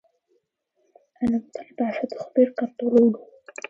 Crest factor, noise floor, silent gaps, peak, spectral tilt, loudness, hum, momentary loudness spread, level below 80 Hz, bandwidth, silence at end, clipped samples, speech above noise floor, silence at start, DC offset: 18 dB; -72 dBFS; none; -6 dBFS; -7 dB/octave; -23 LUFS; none; 15 LU; -60 dBFS; 7.8 kHz; 0.5 s; under 0.1%; 49 dB; 1.2 s; under 0.1%